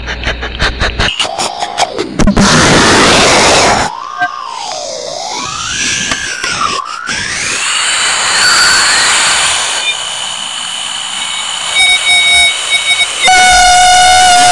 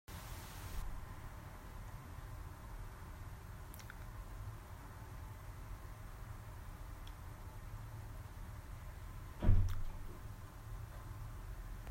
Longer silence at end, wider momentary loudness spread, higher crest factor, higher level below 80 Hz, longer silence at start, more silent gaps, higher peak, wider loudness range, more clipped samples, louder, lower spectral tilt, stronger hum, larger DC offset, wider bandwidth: about the same, 0 s vs 0 s; first, 12 LU vs 6 LU; second, 10 dB vs 26 dB; first, -26 dBFS vs -46 dBFS; about the same, 0 s vs 0.1 s; neither; first, 0 dBFS vs -16 dBFS; about the same, 7 LU vs 8 LU; neither; first, -8 LUFS vs -48 LUFS; second, -1.5 dB/octave vs -6 dB/octave; neither; neither; second, 11.5 kHz vs 16 kHz